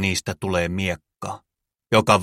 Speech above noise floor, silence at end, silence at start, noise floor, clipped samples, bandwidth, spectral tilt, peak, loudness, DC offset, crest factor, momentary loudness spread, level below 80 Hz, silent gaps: 59 dB; 0 s; 0 s; -79 dBFS; under 0.1%; 16 kHz; -4.5 dB/octave; -2 dBFS; -23 LUFS; under 0.1%; 22 dB; 14 LU; -48 dBFS; none